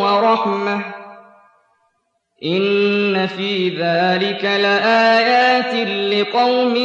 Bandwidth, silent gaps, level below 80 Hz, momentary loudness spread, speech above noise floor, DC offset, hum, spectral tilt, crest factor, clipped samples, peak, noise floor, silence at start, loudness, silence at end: 7.8 kHz; none; -74 dBFS; 9 LU; 52 dB; under 0.1%; none; -5.5 dB/octave; 14 dB; under 0.1%; -4 dBFS; -68 dBFS; 0 s; -16 LUFS; 0 s